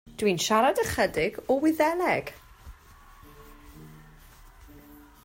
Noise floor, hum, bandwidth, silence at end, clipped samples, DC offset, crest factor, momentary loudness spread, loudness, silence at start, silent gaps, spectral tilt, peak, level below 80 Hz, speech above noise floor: -52 dBFS; none; 16 kHz; 0.3 s; under 0.1%; under 0.1%; 18 dB; 6 LU; -25 LUFS; 0.2 s; none; -4 dB/octave; -10 dBFS; -52 dBFS; 27 dB